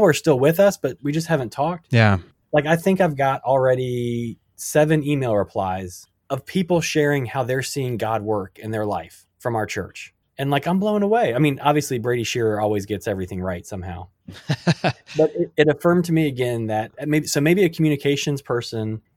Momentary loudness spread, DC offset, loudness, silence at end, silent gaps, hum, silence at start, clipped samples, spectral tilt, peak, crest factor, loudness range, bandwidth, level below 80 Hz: 12 LU; under 0.1%; -21 LUFS; 0.2 s; none; none; 0 s; under 0.1%; -6 dB/octave; -2 dBFS; 18 dB; 4 LU; 17 kHz; -54 dBFS